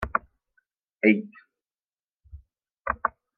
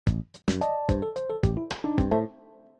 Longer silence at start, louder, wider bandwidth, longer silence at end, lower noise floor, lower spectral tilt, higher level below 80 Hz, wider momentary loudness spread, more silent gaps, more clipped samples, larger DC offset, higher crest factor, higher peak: about the same, 0 s vs 0.05 s; about the same, -26 LUFS vs -28 LUFS; second, 4.6 kHz vs 10.5 kHz; second, 0.3 s vs 0.45 s; first, under -90 dBFS vs -53 dBFS; about the same, -8.5 dB/octave vs -7.5 dB/octave; second, -50 dBFS vs -38 dBFS; first, 15 LU vs 5 LU; first, 1.85-1.89 s, 2.09-2.15 s vs none; neither; neither; first, 24 dB vs 18 dB; first, -6 dBFS vs -10 dBFS